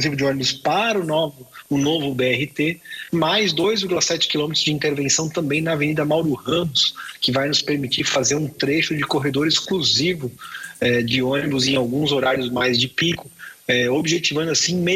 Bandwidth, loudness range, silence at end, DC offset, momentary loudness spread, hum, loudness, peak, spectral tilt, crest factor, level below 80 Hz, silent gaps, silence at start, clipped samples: 15.5 kHz; 1 LU; 0 s; under 0.1%; 5 LU; none; -20 LUFS; -6 dBFS; -3.5 dB/octave; 14 dB; -54 dBFS; none; 0 s; under 0.1%